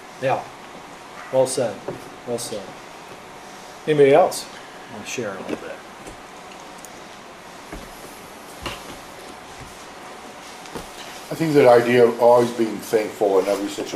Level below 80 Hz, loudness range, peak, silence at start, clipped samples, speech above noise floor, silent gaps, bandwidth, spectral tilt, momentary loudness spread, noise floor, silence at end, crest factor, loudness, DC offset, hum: -54 dBFS; 18 LU; -2 dBFS; 0 s; under 0.1%; 21 dB; none; 15.5 kHz; -5 dB/octave; 24 LU; -40 dBFS; 0 s; 20 dB; -19 LUFS; under 0.1%; none